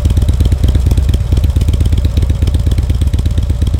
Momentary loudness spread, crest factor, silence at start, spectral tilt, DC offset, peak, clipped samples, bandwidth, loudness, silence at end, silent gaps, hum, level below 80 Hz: 2 LU; 8 dB; 0 s; -7 dB/octave; 0.7%; -2 dBFS; under 0.1%; 16 kHz; -13 LUFS; 0 s; none; none; -12 dBFS